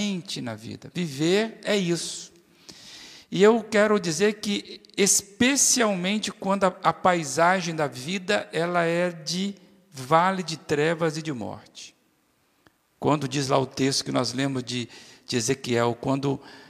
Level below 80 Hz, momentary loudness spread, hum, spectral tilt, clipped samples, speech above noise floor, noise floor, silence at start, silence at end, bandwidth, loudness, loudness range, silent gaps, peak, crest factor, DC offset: -66 dBFS; 17 LU; none; -3.5 dB/octave; under 0.1%; 42 dB; -67 dBFS; 0 s; 0.05 s; 15.5 kHz; -24 LUFS; 6 LU; none; -4 dBFS; 20 dB; under 0.1%